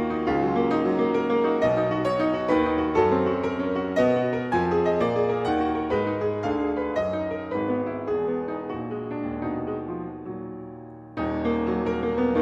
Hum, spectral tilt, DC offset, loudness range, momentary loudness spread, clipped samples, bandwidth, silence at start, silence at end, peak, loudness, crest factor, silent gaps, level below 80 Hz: none; -8 dB/octave; under 0.1%; 7 LU; 9 LU; under 0.1%; 8.4 kHz; 0 s; 0 s; -8 dBFS; -25 LUFS; 16 dB; none; -48 dBFS